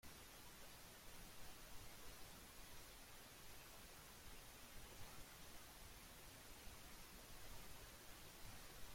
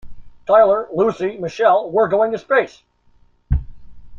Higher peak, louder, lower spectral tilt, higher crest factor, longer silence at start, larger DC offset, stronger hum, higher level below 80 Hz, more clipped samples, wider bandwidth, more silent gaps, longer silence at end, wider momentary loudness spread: second, -42 dBFS vs -2 dBFS; second, -60 LUFS vs -17 LUFS; second, -2.5 dB/octave vs -7 dB/octave; about the same, 16 dB vs 16 dB; about the same, 0.05 s vs 0.05 s; neither; neither; second, -66 dBFS vs -34 dBFS; neither; first, 16.5 kHz vs 7.2 kHz; neither; about the same, 0 s vs 0 s; second, 1 LU vs 11 LU